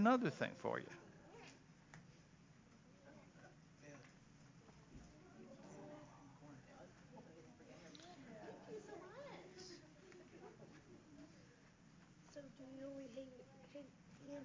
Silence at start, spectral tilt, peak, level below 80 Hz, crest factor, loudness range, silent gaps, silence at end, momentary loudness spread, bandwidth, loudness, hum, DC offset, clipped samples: 0 s; -6 dB/octave; -22 dBFS; -78 dBFS; 28 dB; 9 LU; none; 0 s; 17 LU; 7.6 kHz; -52 LUFS; none; under 0.1%; under 0.1%